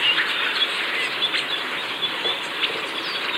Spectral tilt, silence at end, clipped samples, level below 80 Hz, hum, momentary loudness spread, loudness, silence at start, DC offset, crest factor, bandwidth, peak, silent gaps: -1 dB/octave; 0 s; under 0.1%; -74 dBFS; none; 5 LU; -22 LUFS; 0 s; under 0.1%; 16 dB; 16 kHz; -8 dBFS; none